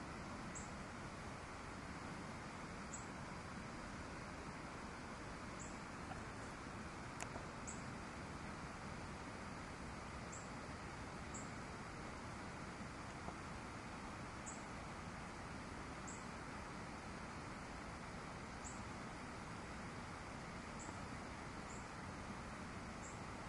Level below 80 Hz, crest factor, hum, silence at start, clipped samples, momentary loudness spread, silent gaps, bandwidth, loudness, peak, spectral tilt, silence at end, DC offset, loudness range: -62 dBFS; 24 dB; none; 0 s; under 0.1%; 1 LU; none; 11.5 kHz; -50 LUFS; -26 dBFS; -4.5 dB/octave; 0 s; under 0.1%; 0 LU